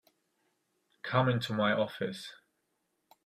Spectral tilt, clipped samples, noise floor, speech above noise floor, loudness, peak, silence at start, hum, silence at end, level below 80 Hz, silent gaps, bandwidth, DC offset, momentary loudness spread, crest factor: -6.5 dB/octave; under 0.1%; -80 dBFS; 49 dB; -31 LUFS; -12 dBFS; 1.05 s; none; 0.9 s; -72 dBFS; none; 14.5 kHz; under 0.1%; 16 LU; 22 dB